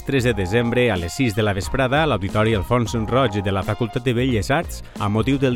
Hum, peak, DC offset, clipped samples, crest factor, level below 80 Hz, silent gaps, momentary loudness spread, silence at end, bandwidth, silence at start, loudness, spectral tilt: none; -6 dBFS; under 0.1%; under 0.1%; 14 dB; -36 dBFS; none; 4 LU; 0 s; 16.5 kHz; 0 s; -20 LUFS; -6 dB/octave